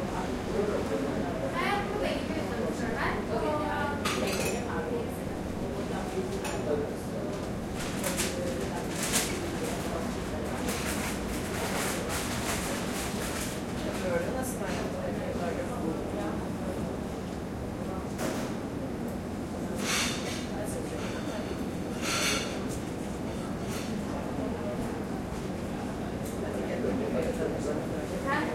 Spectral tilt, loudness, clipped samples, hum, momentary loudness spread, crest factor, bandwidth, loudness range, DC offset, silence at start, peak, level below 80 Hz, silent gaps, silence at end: -4.5 dB/octave; -32 LUFS; under 0.1%; none; 6 LU; 20 dB; 16.5 kHz; 3 LU; under 0.1%; 0 s; -12 dBFS; -46 dBFS; none; 0 s